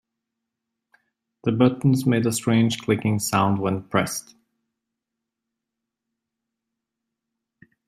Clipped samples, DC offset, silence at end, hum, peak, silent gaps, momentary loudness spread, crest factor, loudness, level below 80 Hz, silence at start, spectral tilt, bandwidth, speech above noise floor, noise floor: under 0.1%; under 0.1%; 3.7 s; none; -4 dBFS; none; 7 LU; 22 dB; -22 LUFS; -62 dBFS; 1.45 s; -5.5 dB/octave; 16 kHz; 63 dB; -84 dBFS